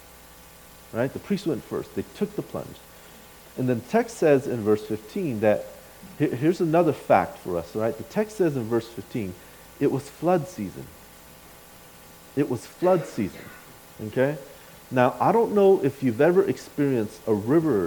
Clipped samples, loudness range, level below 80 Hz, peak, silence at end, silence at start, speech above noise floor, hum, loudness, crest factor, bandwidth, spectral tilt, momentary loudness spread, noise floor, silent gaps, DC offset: under 0.1%; 8 LU; -58 dBFS; -4 dBFS; 0 s; 0.95 s; 24 dB; none; -25 LUFS; 20 dB; 19 kHz; -7 dB/octave; 19 LU; -48 dBFS; none; under 0.1%